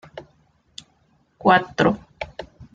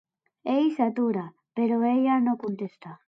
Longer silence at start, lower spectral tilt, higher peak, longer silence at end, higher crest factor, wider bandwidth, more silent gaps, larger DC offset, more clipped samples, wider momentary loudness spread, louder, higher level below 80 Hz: second, 0.15 s vs 0.45 s; second, -6 dB/octave vs -8.5 dB/octave; first, -2 dBFS vs -10 dBFS; about the same, 0.1 s vs 0.1 s; first, 22 dB vs 16 dB; first, 9 kHz vs 5.4 kHz; neither; neither; neither; first, 25 LU vs 13 LU; first, -20 LUFS vs -25 LUFS; first, -52 dBFS vs -80 dBFS